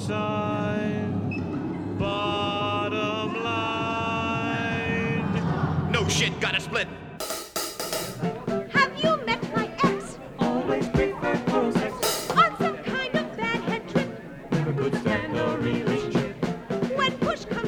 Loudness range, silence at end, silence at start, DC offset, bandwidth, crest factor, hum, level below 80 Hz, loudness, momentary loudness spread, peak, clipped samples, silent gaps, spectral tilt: 2 LU; 0 s; 0 s; under 0.1%; over 20 kHz; 18 dB; none; -50 dBFS; -26 LUFS; 7 LU; -8 dBFS; under 0.1%; none; -5 dB/octave